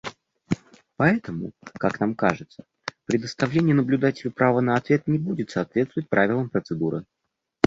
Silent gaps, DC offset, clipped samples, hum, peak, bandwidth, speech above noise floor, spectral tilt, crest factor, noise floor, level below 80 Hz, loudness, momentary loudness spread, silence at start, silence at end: none; under 0.1%; under 0.1%; none; -2 dBFS; 7.8 kHz; 36 dB; -7 dB/octave; 22 dB; -59 dBFS; -58 dBFS; -24 LUFS; 13 LU; 0.05 s; 0 s